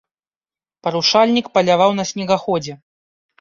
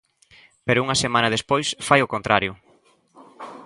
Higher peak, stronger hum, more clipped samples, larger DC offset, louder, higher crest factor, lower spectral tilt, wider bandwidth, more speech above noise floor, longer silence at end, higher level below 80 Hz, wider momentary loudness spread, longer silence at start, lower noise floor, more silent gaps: about the same, -2 dBFS vs 0 dBFS; neither; neither; neither; first, -17 LUFS vs -21 LUFS; about the same, 18 dB vs 22 dB; about the same, -4.5 dB/octave vs -3.5 dB/octave; second, 7.6 kHz vs 11.5 kHz; first, over 74 dB vs 38 dB; first, 0.65 s vs 0 s; second, -62 dBFS vs -54 dBFS; second, 10 LU vs 13 LU; first, 0.85 s vs 0.65 s; first, under -90 dBFS vs -59 dBFS; neither